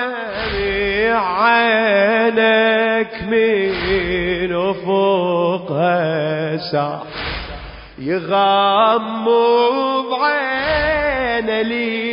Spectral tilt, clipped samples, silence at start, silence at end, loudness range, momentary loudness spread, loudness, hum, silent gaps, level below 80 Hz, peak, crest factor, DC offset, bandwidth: -10 dB/octave; under 0.1%; 0 s; 0 s; 4 LU; 9 LU; -16 LUFS; none; none; -38 dBFS; -2 dBFS; 14 dB; under 0.1%; 5.4 kHz